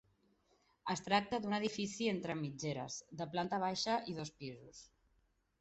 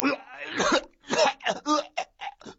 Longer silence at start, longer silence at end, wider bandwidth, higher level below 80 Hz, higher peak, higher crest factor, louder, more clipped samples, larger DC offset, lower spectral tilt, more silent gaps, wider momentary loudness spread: first, 0.85 s vs 0 s; first, 0.75 s vs 0.05 s; about the same, 8.2 kHz vs 8 kHz; second, -72 dBFS vs -60 dBFS; second, -18 dBFS vs 0 dBFS; second, 22 dB vs 28 dB; second, -39 LUFS vs -27 LUFS; neither; neither; first, -4.5 dB/octave vs -2.5 dB/octave; neither; first, 14 LU vs 11 LU